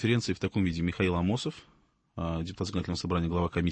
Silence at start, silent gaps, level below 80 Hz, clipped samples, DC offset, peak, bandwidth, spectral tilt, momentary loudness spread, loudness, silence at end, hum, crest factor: 0 s; none; -48 dBFS; under 0.1%; under 0.1%; -12 dBFS; 8.8 kHz; -6.5 dB/octave; 9 LU; -31 LUFS; 0 s; none; 18 dB